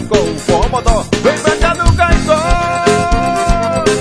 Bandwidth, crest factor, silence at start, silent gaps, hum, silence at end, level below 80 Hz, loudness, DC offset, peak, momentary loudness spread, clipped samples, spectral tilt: 11 kHz; 12 dB; 0 s; none; none; 0 s; -18 dBFS; -13 LUFS; under 0.1%; 0 dBFS; 2 LU; 0.2%; -5 dB/octave